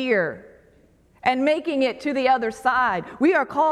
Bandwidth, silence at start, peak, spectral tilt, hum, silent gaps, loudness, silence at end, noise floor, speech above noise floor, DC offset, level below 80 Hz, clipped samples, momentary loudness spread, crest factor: 12.5 kHz; 0 s; -6 dBFS; -5 dB/octave; none; none; -22 LUFS; 0 s; -56 dBFS; 35 dB; under 0.1%; -60 dBFS; under 0.1%; 4 LU; 16 dB